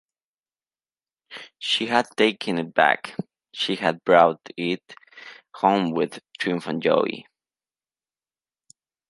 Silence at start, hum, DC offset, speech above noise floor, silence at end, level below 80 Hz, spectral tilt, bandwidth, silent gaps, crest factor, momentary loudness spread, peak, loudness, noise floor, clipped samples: 1.3 s; none; under 0.1%; over 68 dB; 1.9 s; -74 dBFS; -5 dB/octave; 11.5 kHz; none; 24 dB; 22 LU; -2 dBFS; -22 LUFS; under -90 dBFS; under 0.1%